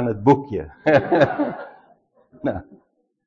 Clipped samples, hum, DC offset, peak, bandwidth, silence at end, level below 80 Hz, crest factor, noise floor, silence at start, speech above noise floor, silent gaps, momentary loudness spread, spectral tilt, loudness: under 0.1%; none; under 0.1%; -4 dBFS; 7.4 kHz; 0.65 s; -50 dBFS; 18 dB; -57 dBFS; 0 s; 37 dB; none; 17 LU; -8 dB/octave; -20 LUFS